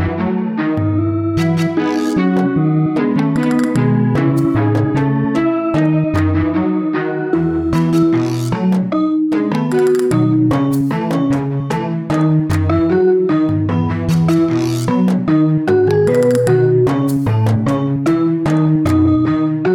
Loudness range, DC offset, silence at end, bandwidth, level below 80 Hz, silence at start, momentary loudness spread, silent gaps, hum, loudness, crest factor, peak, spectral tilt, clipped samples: 2 LU; under 0.1%; 0 s; 15.5 kHz; -42 dBFS; 0 s; 4 LU; none; none; -15 LUFS; 12 dB; -2 dBFS; -8 dB/octave; under 0.1%